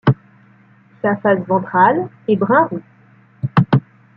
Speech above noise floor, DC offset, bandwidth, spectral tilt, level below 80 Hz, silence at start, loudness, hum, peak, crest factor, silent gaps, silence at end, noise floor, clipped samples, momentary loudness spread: 34 dB; under 0.1%; 5.4 kHz; -10.5 dB/octave; -54 dBFS; 0.05 s; -17 LUFS; none; -2 dBFS; 16 dB; none; 0.4 s; -49 dBFS; under 0.1%; 9 LU